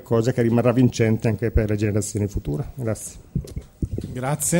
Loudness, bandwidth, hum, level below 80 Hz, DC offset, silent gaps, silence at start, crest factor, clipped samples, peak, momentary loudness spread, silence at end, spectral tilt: -23 LUFS; 16.5 kHz; none; -34 dBFS; under 0.1%; none; 0 s; 16 dB; under 0.1%; -6 dBFS; 12 LU; 0 s; -6 dB/octave